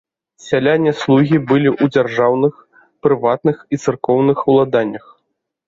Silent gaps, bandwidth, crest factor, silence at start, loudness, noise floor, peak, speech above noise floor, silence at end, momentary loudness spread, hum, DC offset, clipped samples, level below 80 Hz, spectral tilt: none; 7.8 kHz; 14 dB; 0.45 s; -15 LUFS; -71 dBFS; -2 dBFS; 57 dB; 0.7 s; 7 LU; none; under 0.1%; under 0.1%; -56 dBFS; -7.5 dB/octave